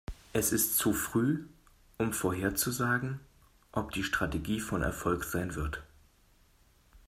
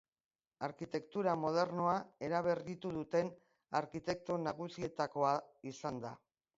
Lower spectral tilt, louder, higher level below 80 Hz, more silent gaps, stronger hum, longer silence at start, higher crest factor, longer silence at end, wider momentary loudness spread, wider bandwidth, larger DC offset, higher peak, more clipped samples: about the same, -4 dB/octave vs -5 dB/octave; first, -32 LUFS vs -38 LUFS; first, -48 dBFS vs -74 dBFS; neither; neither; second, 0.1 s vs 0.6 s; about the same, 20 dB vs 20 dB; second, 0.1 s vs 0.4 s; about the same, 10 LU vs 10 LU; first, 16 kHz vs 7.6 kHz; neither; first, -14 dBFS vs -20 dBFS; neither